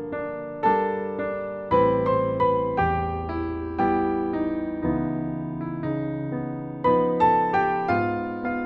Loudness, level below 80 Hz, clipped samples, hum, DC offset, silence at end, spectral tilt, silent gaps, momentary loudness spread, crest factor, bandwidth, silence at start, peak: -25 LUFS; -46 dBFS; under 0.1%; none; under 0.1%; 0 s; -9.5 dB/octave; none; 10 LU; 16 dB; 5.8 kHz; 0 s; -8 dBFS